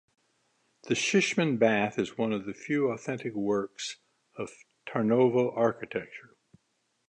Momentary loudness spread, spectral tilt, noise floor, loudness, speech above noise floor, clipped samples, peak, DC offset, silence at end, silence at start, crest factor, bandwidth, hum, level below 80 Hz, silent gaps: 16 LU; -5 dB/octave; -76 dBFS; -28 LUFS; 48 dB; under 0.1%; -10 dBFS; under 0.1%; 0.9 s; 0.85 s; 20 dB; 10.5 kHz; none; -72 dBFS; none